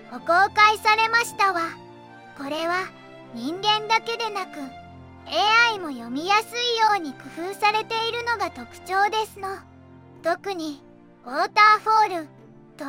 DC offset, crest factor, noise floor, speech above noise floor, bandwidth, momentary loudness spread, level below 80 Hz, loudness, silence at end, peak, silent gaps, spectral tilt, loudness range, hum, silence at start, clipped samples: under 0.1%; 20 dB; -47 dBFS; 25 dB; 16.5 kHz; 18 LU; -66 dBFS; -22 LUFS; 0 s; -4 dBFS; none; -2 dB/octave; 5 LU; none; 0 s; under 0.1%